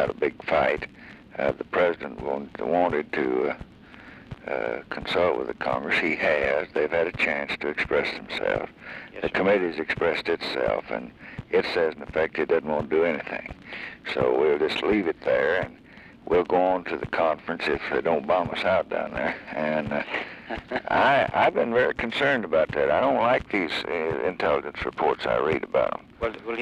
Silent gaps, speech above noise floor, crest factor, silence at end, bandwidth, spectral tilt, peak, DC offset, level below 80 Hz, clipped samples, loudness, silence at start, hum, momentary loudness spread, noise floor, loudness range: none; 21 dB; 16 dB; 0 s; 11 kHz; -6 dB/octave; -10 dBFS; under 0.1%; -52 dBFS; under 0.1%; -25 LUFS; 0 s; none; 10 LU; -47 dBFS; 4 LU